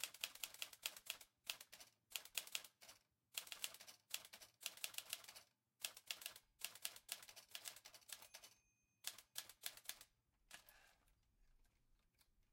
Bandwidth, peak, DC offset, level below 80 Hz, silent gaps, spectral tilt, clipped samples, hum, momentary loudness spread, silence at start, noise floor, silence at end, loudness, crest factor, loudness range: 17 kHz; -22 dBFS; under 0.1%; -86 dBFS; none; 2 dB/octave; under 0.1%; none; 14 LU; 0 s; -83 dBFS; 0.1 s; -52 LUFS; 34 dB; 6 LU